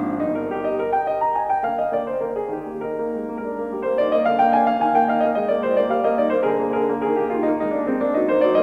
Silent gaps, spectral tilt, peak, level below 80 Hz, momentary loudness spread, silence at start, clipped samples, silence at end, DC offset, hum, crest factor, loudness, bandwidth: none; -7.5 dB/octave; -6 dBFS; -56 dBFS; 9 LU; 0 s; under 0.1%; 0 s; under 0.1%; none; 14 dB; -21 LUFS; 6 kHz